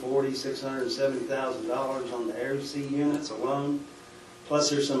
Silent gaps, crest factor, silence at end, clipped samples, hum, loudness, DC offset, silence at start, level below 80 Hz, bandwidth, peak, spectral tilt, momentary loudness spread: none; 16 dB; 0 s; under 0.1%; none; -29 LUFS; under 0.1%; 0 s; -68 dBFS; 12.5 kHz; -14 dBFS; -4.5 dB/octave; 8 LU